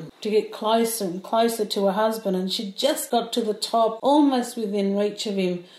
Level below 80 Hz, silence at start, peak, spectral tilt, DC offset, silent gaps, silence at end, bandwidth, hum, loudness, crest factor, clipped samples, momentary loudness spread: -74 dBFS; 0 s; -8 dBFS; -4.5 dB/octave; under 0.1%; none; 0 s; 16 kHz; none; -23 LUFS; 14 dB; under 0.1%; 6 LU